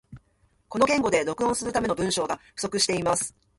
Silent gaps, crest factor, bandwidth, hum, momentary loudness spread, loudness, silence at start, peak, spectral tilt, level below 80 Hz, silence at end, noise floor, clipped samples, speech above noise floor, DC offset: none; 20 dB; 12 kHz; none; 8 LU; -25 LUFS; 0.1 s; -8 dBFS; -3 dB/octave; -54 dBFS; 0.3 s; -66 dBFS; under 0.1%; 40 dB; under 0.1%